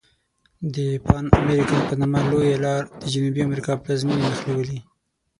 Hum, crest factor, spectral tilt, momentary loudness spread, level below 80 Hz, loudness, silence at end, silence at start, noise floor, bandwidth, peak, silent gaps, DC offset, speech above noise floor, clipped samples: none; 22 dB; -7 dB/octave; 9 LU; -36 dBFS; -22 LUFS; 0.6 s; 0.6 s; -65 dBFS; 11.5 kHz; 0 dBFS; none; under 0.1%; 44 dB; under 0.1%